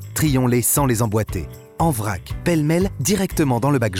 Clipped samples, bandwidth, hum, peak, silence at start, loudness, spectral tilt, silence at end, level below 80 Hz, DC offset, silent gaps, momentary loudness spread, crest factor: under 0.1%; 18 kHz; none; -8 dBFS; 0 s; -19 LUFS; -5.5 dB/octave; 0 s; -36 dBFS; under 0.1%; none; 9 LU; 10 dB